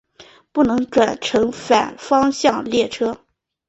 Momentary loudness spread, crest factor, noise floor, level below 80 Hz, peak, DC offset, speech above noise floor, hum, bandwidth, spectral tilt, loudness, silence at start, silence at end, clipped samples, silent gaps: 7 LU; 16 dB; -48 dBFS; -52 dBFS; -2 dBFS; under 0.1%; 30 dB; none; 8.2 kHz; -4 dB/octave; -18 LUFS; 0.2 s; 0.5 s; under 0.1%; none